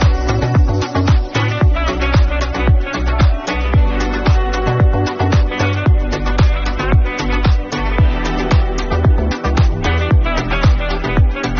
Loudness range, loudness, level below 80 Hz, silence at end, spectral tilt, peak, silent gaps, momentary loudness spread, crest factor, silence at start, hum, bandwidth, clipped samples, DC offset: 1 LU; -16 LUFS; -16 dBFS; 0 s; -6.5 dB/octave; -2 dBFS; none; 3 LU; 12 dB; 0 s; none; 7.2 kHz; under 0.1%; under 0.1%